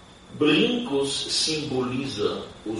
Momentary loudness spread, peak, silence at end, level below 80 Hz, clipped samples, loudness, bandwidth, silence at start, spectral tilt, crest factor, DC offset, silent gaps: 8 LU; -8 dBFS; 0 s; -56 dBFS; under 0.1%; -24 LUFS; 11.5 kHz; 0 s; -3.5 dB/octave; 16 dB; under 0.1%; none